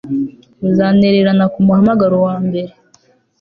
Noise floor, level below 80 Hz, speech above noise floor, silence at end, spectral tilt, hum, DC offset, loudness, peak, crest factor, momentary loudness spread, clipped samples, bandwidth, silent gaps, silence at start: -53 dBFS; -48 dBFS; 41 dB; 0.7 s; -9.5 dB/octave; none; under 0.1%; -13 LUFS; -2 dBFS; 12 dB; 12 LU; under 0.1%; 5 kHz; none; 0.05 s